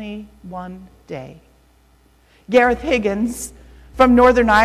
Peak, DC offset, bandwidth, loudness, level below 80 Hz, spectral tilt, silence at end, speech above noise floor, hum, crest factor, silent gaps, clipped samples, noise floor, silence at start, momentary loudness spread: -4 dBFS; under 0.1%; 14.5 kHz; -15 LUFS; -38 dBFS; -5 dB/octave; 0 s; 37 dB; none; 14 dB; none; under 0.1%; -54 dBFS; 0 s; 22 LU